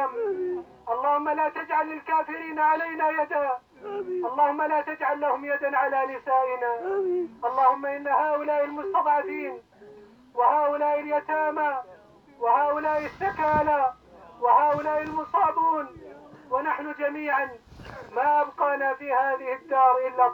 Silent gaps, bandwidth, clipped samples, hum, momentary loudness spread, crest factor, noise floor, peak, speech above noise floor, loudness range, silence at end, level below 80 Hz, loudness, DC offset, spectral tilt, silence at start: none; over 20 kHz; under 0.1%; none; 10 LU; 18 dB; -52 dBFS; -8 dBFS; 27 dB; 2 LU; 0 s; -62 dBFS; -25 LUFS; under 0.1%; -7 dB/octave; 0 s